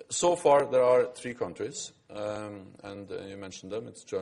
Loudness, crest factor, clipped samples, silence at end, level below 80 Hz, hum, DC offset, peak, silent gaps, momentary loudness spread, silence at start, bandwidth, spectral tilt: -28 LUFS; 18 dB; under 0.1%; 0 s; -68 dBFS; none; under 0.1%; -10 dBFS; none; 19 LU; 0 s; 11.5 kHz; -4 dB/octave